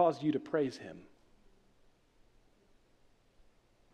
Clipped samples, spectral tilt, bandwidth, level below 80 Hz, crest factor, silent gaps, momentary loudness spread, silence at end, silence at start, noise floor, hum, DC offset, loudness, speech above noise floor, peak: under 0.1%; -7 dB/octave; 10 kHz; -70 dBFS; 22 dB; none; 20 LU; 2.95 s; 0 s; -67 dBFS; none; under 0.1%; -34 LUFS; 33 dB; -16 dBFS